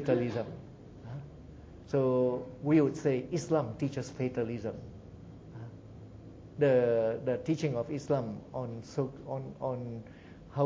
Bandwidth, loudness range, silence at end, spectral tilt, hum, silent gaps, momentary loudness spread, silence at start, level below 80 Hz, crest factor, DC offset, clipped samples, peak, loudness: 8 kHz; 5 LU; 0 s; -7.5 dB/octave; none; none; 23 LU; 0 s; -60 dBFS; 18 dB; under 0.1%; under 0.1%; -14 dBFS; -32 LUFS